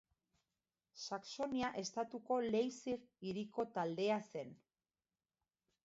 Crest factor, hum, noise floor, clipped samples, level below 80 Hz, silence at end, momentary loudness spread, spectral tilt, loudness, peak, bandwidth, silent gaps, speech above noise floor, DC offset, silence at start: 18 dB; none; under -90 dBFS; under 0.1%; -78 dBFS; 1.3 s; 10 LU; -4 dB/octave; -42 LUFS; -26 dBFS; 7.6 kHz; none; over 49 dB; under 0.1%; 0.95 s